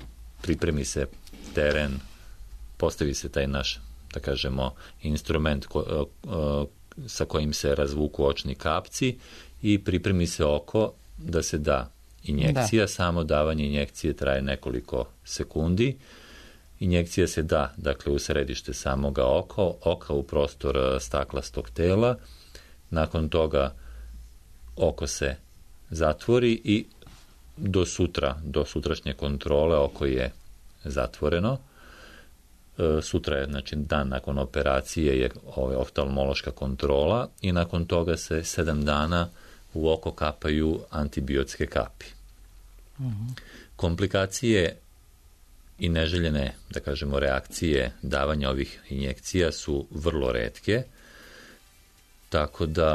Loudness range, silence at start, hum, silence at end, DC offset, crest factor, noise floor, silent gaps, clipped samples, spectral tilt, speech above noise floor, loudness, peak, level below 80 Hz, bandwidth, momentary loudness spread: 3 LU; 0 s; none; 0 s; under 0.1%; 16 dB; -56 dBFS; none; under 0.1%; -5.5 dB/octave; 30 dB; -27 LUFS; -10 dBFS; -38 dBFS; 13.5 kHz; 11 LU